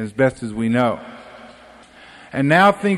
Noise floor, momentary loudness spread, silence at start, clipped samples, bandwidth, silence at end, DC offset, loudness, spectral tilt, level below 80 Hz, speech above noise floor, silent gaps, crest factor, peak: -45 dBFS; 19 LU; 0 s; under 0.1%; 13 kHz; 0 s; under 0.1%; -18 LUFS; -6.5 dB/octave; -54 dBFS; 28 dB; none; 16 dB; -2 dBFS